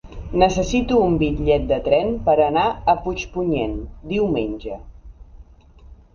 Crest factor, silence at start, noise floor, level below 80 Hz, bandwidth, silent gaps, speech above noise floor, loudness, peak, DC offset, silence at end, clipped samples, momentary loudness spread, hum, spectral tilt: 20 dB; 0.05 s; -46 dBFS; -34 dBFS; 7.2 kHz; none; 27 dB; -20 LUFS; 0 dBFS; under 0.1%; 0.2 s; under 0.1%; 10 LU; none; -6.5 dB/octave